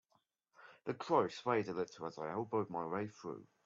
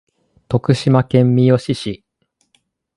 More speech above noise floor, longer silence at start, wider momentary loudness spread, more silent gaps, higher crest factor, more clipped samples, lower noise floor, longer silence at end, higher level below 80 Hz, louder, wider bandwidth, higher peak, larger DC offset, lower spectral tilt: second, 41 dB vs 49 dB; about the same, 0.6 s vs 0.5 s; about the same, 12 LU vs 12 LU; neither; about the same, 20 dB vs 16 dB; neither; first, -79 dBFS vs -63 dBFS; second, 0.2 s vs 1 s; second, -82 dBFS vs -50 dBFS; second, -39 LUFS vs -15 LUFS; second, 7.6 kHz vs 11 kHz; second, -20 dBFS vs 0 dBFS; neither; second, -5 dB/octave vs -8 dB/octave